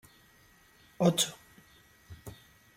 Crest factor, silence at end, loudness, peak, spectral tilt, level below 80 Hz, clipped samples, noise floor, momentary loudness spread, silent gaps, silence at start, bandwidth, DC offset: 24 dB; 0.45 s; -29 LUFS; -12 dBFS; -4 dB/octave; -66 dBFS; under 0.1%; -62 dBFS; 26 LU; none; 1 s; 16.5 kHz; under 0.1%